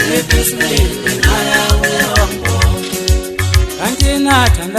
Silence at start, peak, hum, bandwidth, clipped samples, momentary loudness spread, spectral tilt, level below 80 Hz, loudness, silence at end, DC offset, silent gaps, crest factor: 0 s; 0 dBFS; none; 14.5 kHz; under 0.1%; 5 LU; -4 dB/octave; -18 dBFS; -13 LUFS; 0 s; under 0.1%; none; 12 dB